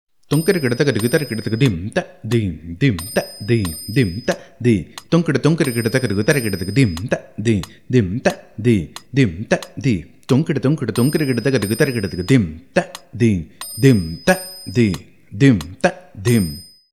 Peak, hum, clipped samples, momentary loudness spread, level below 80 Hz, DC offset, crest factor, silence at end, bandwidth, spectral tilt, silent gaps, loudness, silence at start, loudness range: 0 dBFS; none; under 0.1%; 7 LU; -46 dBFS; 0.3%; 18 dB; 0.3 s; 14.5 kHz; -6 dB/octave; none; -19 LUFS; 0.3 s; 2 LU